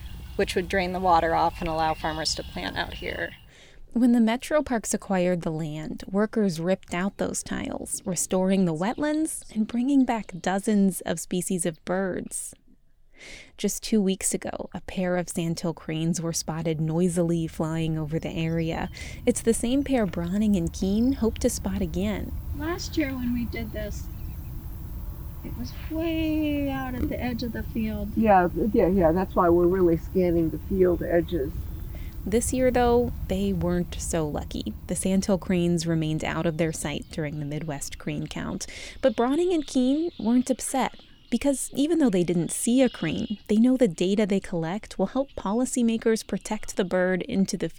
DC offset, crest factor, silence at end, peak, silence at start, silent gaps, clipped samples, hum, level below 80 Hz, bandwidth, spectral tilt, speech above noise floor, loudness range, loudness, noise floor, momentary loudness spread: under 0.1%; 16 dB; 0 s; -8 dBFS; 0 s; none; under 0.1%; none; -40 dBFS; over 20 kHz; -5.5 dB/octave; 30 dB; 6 LU; -26 LUFS; -55 dBFS; 11 LU